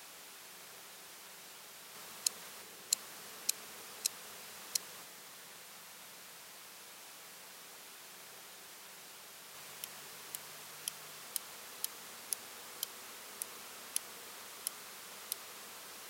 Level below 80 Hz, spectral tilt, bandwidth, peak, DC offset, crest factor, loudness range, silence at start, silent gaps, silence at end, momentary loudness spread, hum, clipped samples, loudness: under -90 dBFS; 1 dB/octave; 16.5 kHz; -10 dBFS; under 0.1%; 36 dB; 10 LU; 0 s; none; 0 s; 13 LU; 50 Hz at -80 dBFS; under 0.1%; -43 LUFS